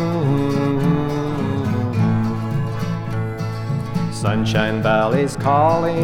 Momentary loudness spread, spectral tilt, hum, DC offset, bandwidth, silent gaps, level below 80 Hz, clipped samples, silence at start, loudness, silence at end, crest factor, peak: 7 LU; -7 dB/octave; none; under 0.1%; 14.5 kHz; none; -42 dBFS; under 0.1%; 0 s; -20 LUFS; 0 s; 16 dB; -2 dBFS